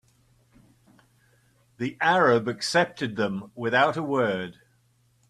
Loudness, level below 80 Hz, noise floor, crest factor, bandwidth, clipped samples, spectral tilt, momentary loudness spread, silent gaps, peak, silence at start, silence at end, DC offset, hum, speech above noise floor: -24 LUFS; -68 dBFS; -65 dBFS; 20 dB; 13 kHz; under 0.1%; -5 dB/octave; 12 LU; none; -8 dBFS; 1.8 s; 0.75 s; under 0.1%; none; 41 dB